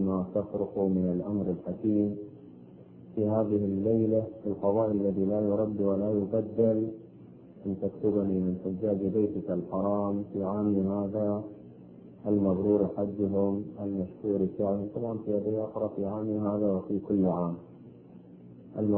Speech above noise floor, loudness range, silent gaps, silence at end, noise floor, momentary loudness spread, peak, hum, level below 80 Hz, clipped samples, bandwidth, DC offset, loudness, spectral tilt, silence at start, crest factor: 22 dB; 3 LU; none; 0 s; -50 dBFS; 8 LU; -14 dBFS; none; -58 dBFS; under 0.1%; 3.1 kHz; under 0.1%; -30 LUFS; -14 dB/octave; 0 s; 16 dB